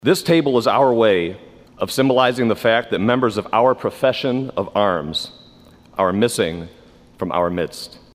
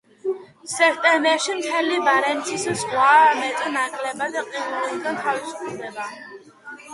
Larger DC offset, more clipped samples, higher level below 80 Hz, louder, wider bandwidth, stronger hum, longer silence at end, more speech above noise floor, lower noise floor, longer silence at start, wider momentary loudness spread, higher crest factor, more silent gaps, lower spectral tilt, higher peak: neither; neither; first, -54 dBFS vs -70 dBFS; about the same, -18 LUFS vs -20 LUFS; first, 16 kHz vs 11.5 kHz; neither; first, 0.25 s vs 0 s; first, 29 dB vs 21 dB; first, -47 dBFS vs -41 dBFS; second, 0.05 s vs 0.25 s; second, 12 LU vs 16 LU; about the same, 18 dB vs 18 dB; neither; first, -5 dB/octave vs -2 dB/octave; about the same, -2 dBFS vs -4 dBFS